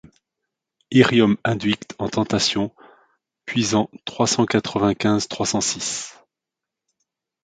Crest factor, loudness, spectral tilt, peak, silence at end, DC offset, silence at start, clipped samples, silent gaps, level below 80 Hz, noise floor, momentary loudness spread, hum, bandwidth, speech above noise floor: 22 dB; -20 LUFS; -4 dB/octave; 0 dBFS; 1.35 s; under 0.1%; 0.9 s; under 0.1%; none; -54 dBFS; -86 dBFS; 10 LU; none; 9.6 kHz; 66 dB